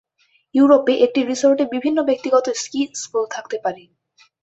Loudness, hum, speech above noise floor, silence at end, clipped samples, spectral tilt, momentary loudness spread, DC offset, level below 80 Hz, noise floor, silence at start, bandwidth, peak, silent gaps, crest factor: -18 LUFS; none; 44 dB; 0.65 s; under 0.1%; -3 dB/octave; 12 LU; under 0.1%; -66 dBFS; -62 dBFS; 0.55 s; 8.2 kHz; -2 dBFS; none; 18 dB